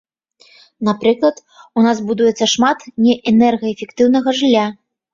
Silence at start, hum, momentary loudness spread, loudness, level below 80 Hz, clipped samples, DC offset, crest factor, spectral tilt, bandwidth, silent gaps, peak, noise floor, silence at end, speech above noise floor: 0.8 s; none; 8 LU; -15 LUFS; -58 dBFS; under 0.1%; under 0.1%; 14 dB; -4.5 dB/octave; 7.6 kHz; none; 0 dBFS; -51 dBFS; 0.4 s; 37 dB